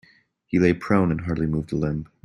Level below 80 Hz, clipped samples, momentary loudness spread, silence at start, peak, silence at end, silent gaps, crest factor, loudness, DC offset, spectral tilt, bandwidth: -46 dBFS; under 0.1%; 6 LU; 0.5 s; -6 dBFS; 0.2 s; none; 18 dB; -23 LUFS; under 0.1%; -8.5 dB/octave; 10.5 kHz